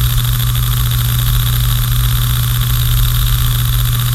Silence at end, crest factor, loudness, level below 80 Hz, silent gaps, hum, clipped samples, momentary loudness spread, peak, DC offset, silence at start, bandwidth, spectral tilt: 0 s; 12 dB; -14 LUFS; -18 dBFS; none; none; under 0.1%; 1 LU; 0 dBFS; under 0.1%; 0 s; 16.5 kHz; -4 dB/octave